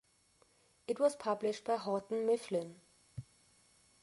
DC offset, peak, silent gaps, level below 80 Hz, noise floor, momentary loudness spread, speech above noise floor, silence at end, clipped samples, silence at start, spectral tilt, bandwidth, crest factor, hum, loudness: under 0.1%; -18 dBFS; none; -74 dBFS; -71 dBFS; 19 LU; 36 dB; 0.8 s; under 0.1%; 0.9 s; -5.5 dB/octave; 11.5 kHz; 20 dB; none; -36 LUFS